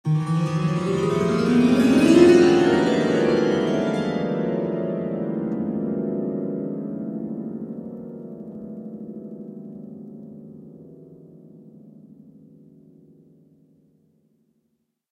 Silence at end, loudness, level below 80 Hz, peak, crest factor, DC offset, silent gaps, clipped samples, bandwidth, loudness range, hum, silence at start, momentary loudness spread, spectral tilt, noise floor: 3.05 s; -21 LUFS; -58 dBFS; 0 dBFS; 22 dB; under 0.1%; none; under 0.1%; 12 kHz; 22 LU; none; 0.05 s; 22 LU; -7 dB/octave; -73 dBFS